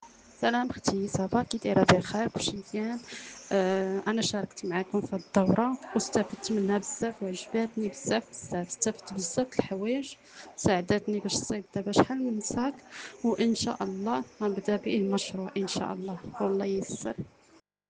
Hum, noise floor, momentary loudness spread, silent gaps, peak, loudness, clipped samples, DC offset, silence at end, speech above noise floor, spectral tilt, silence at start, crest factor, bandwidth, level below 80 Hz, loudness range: none; -62 dBFS; 9 LU; none; -6 dBFS; -30 LUFS; under 0.1%; under 0.1%; 0.6 s; 32 dB; -4.5 dB/octave; 0 s; 24 dB; 10 kHz; -62 dBFS; 3 LU